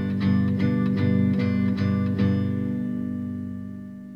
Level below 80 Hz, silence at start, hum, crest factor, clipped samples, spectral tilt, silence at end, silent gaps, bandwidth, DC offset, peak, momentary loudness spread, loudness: -58 dBFS; 0 s; 60 Hz at -50 dBFS; 12 dB; under 0.1%; -9.5 dB/octave; 0 s; none; 5.4 kHz; 0.1%; -10 dBFS; 11 LU; -24 LUFS